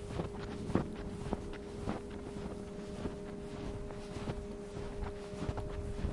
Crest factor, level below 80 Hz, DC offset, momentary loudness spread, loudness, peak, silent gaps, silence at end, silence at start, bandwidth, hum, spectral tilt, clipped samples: 24 dB; -48 dBFS; under 0.1%; 8 LU; -42 LUFS; -16 dBFS; none; 0 s; 0 s; 11.5 kHz; none; -7 dB/octave; under 0.1%